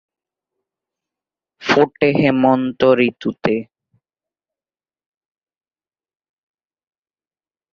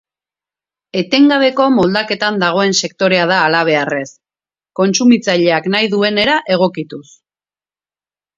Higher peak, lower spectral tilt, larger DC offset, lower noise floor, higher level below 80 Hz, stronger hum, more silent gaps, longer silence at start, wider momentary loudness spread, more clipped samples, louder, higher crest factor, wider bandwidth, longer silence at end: about the same, 0 dBFS vs 0 dBFS; first, -6.5 dB/octave vs -4 dB/octave; neither; about the same, under -90 dBFS vs under -90 dBFS; about the same, -58 dBFS vs -56 dBFS; neither; neither; first, 1.6 s vs 0.95 s; second, 8 LU vs 11 LU; neither; second, -16 LUFS vs -13 LUFS; first, 20 dB vs 14 dB; about the same, 7.2 kHz vs 7.8 kHz; first, 4.1 s vs 1.35 s